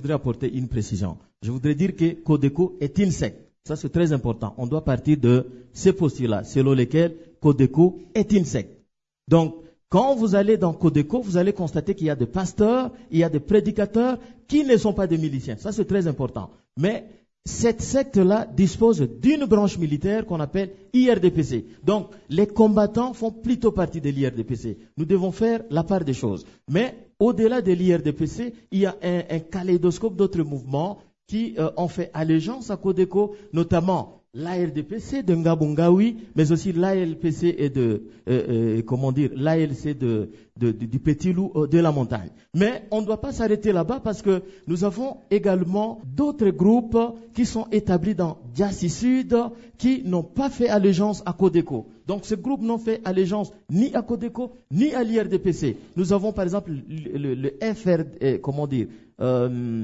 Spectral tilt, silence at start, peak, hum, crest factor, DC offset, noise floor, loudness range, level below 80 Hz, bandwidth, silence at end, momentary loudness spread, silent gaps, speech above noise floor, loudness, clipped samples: -7.5 dB/octave; 0 s; -4 dBFS; none; 18 dB; under 0.1%; -64 dBFS; 4 LU; -48 dBFS; 8 kHz; 0 s; 9 LU; none; 42 dB; -23 LUFS; under 0.1%